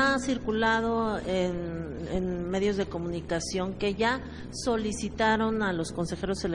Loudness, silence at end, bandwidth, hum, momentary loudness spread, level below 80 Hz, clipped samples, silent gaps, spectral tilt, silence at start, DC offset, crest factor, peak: -29 LUFS; 0 s; 11.5 kHz; none; 8 LU; -46 dBFS; under 0.1%; none; -5 dB/octave; 0 s; under 0.1%; 18 dB; -12 dBFS